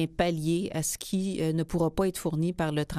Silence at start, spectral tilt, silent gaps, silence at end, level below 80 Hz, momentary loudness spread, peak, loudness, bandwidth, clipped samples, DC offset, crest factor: 0 s; -5.5 dB/octave; none; 0 s; -48 dBFS; 3 LU; -12 dBFS; -29 LUFS; 15.5 kHz; under 0.1%; under 0.1%; 18 dB